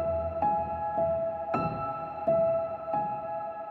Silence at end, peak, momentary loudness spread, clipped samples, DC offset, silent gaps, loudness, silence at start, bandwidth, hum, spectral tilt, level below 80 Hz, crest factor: 0 s; -14 dBFS; 8 LU; under 0.1%; under 0.1%; none; -30 LUFS; 0 s; 4.4 kHz; none; -10 dB/octave; -52 dBFS; 14 dB